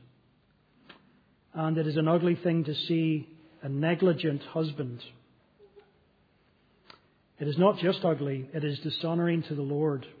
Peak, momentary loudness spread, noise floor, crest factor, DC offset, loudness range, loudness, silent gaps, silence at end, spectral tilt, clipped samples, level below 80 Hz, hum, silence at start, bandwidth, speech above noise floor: -10 dBFS; 12 LU; -66 dBFS; 20 dB; under 0.1%; 6 LU; -29 LUFS; none; 0.05 s; -9.5 dB/octave; under 0.1%; -76 dBFS; 50 Hz at -55 dBFS; 1.55 s; 5 kHz; 38 dB